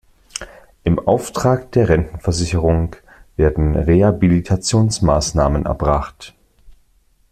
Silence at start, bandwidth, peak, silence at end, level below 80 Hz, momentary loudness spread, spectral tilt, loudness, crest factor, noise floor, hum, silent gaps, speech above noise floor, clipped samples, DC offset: 0.35 s; 14 kHz; -2 dBFS; 0.6 s; -28 dBFS; 17 LU; -6 dB/octave; -17 LUFS; 16 dB; -56 dBFS; none; none; 41 dB; under 0.1%; under 0.1%